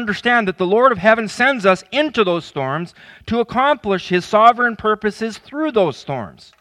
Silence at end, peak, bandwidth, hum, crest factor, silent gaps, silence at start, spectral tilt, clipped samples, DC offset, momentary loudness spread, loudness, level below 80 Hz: 0.3 s; 0 dBFS; 12 kHz; none; 18 dB; none; 0 s; -5.5 dB/octave; under 0.1%; under 0.1%; 14 LU; -17 LUFS; -52 dBFS